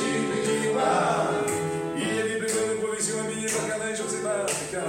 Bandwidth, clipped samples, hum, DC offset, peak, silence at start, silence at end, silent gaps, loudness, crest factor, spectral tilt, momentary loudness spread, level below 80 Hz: 16.5 kHz; under 0.1%; none; under 0.1%; -10 dBFS; 0 s; 0 s; none; -26 LUFS; 16 dB; -3.5 dB/octave; 5 LU; -62 dBFS